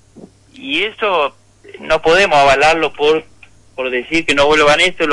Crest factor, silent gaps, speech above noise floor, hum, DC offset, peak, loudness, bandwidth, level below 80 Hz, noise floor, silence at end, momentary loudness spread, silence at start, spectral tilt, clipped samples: 12 dB; none; 28 dB; none; under 0.1%; -4 dBFS; -13 LUFS; 11.5 kHz; -40 dBFS; -41 dBFS; 0 s; 12 LU; 0.15 s; -3 dB/octave; under 0.1%